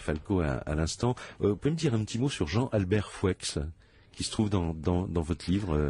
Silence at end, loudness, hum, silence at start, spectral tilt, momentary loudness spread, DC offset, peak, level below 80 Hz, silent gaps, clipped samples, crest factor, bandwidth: 0 s; -30 LUFS; none; 0 s; -6 dB/octave; 4 LU; under 0.1%; -14 dBFS; -42 dBFS; none; under 0.1%; 14 dB; 11.5 kHz